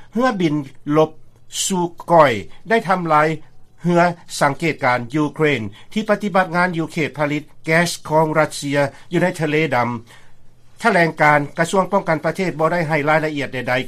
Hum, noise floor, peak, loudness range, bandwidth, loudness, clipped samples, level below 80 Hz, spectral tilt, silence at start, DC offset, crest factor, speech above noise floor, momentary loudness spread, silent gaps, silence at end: none; -38 dBFS; 0 dBFS; 2 LU; 15 kHz; -18 LUFS; under 0.1%; -48 dBFS; -5 dB/octave; 0 s; under 0.1%; 18 dB; 20 dB; 8 LU; none; 0 s